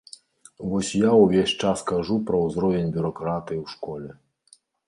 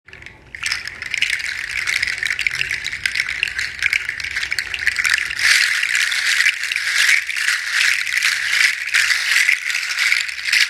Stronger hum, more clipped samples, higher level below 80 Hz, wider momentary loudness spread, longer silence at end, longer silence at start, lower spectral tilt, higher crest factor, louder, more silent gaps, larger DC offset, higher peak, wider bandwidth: neither; neither; about the same, -52 dBFS vs -52 dBFS; first, 17 LU vs 8 LU; first, 0.75 s vs 0 s; first, 0.6 s vs 0.15 s; first, -6 dB/octave vs 2.5 dB/octave; about the same, 20 dB vs 20 dB; second, -23 LUFS vs -17 LUFS; neither; neither; second, -4 dBFS vs 0 dBFS; second, 11.5 kHz vs 17 kHz